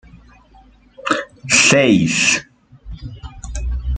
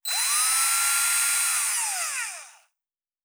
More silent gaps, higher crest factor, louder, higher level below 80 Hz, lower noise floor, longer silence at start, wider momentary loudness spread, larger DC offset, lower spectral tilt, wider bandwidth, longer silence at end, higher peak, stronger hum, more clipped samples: neither; about the same, 18 dB vs 16 dB; first, -14 LUFS vs -21 LUFS; first, -30 dBFS vs -82 dBFS; second, -48 dBFS vs under -90 dBFS; about the same, 0.15 s vs 0.05 s; first, 23 LU vs 10 LU; neither; first, -3 dB/octave vs 6 dB/octave; second, 9.6 kHz vs over 20 kHz; second, 0 s vs 0.75 s; first, 0 dBFS vs -10 dBFS; neither; neither